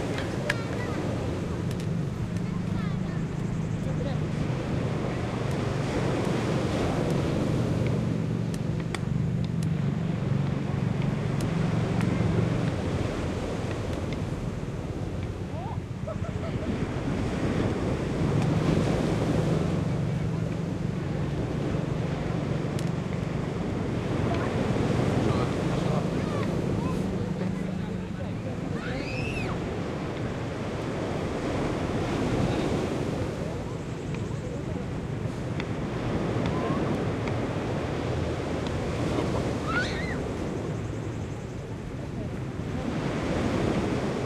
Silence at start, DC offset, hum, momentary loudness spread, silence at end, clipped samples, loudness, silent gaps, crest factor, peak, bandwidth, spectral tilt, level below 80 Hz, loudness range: 0 s; under 0.1%; none; 7 LU; 0 s; under 0.1%; -29 LUFS; none; 18 dB; -10 dBFS; 13 kHz; -7 dB/octave; -42 dBFS; 4 LU